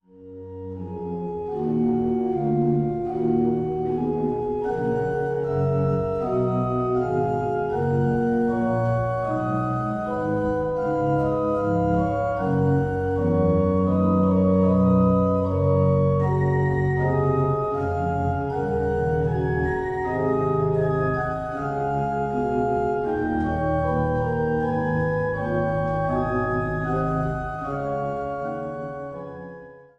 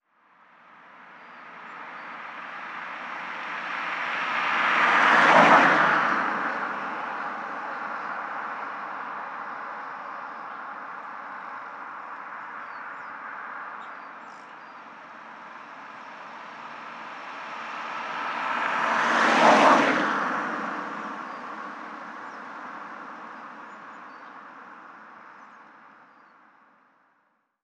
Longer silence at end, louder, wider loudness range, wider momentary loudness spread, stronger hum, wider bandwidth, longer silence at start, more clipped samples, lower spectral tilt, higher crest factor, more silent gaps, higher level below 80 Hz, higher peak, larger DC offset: second, 0.2 s vs 1.75 s; about the same, -23 LUFS vs -24 LUFS; second, 4 LU vs 21 LU; second, 8 LU vs 25 LU; neither; second, 7.4 kHz vs 11.5 kHz; second, 0.15 s vs 0.7 s; neither; first, -10 dB/octave vs -3.5 dB/octave; second, 14 dB vs 24 dB; neither; first, -42 dBFS vs -78 dBFS; second, -8 dBFS vs -2 dBFS; neither